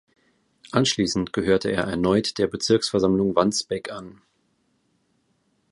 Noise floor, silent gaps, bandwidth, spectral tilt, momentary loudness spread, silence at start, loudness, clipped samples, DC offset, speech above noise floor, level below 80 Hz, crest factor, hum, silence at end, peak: -68 dBFS; none; 11.5 kHz; -4.5 dB/octave; 8 LU; 0.75 s; -22 LUFS; under 0.1%; under 0.1%; 46 dB; -52 dBFS; 22 dB; none; 1.6 s; -2 dBFS